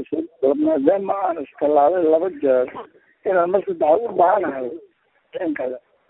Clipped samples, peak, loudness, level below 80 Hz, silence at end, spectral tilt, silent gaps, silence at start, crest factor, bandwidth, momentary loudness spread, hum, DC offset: under 0.1%; -2 dBFS; -20 LUFS; -64 dBFS; 0.3 s; -11 dB/octave; none; 0 s; 18 dB; 4 kHz; 13 LU; none; under 0.1%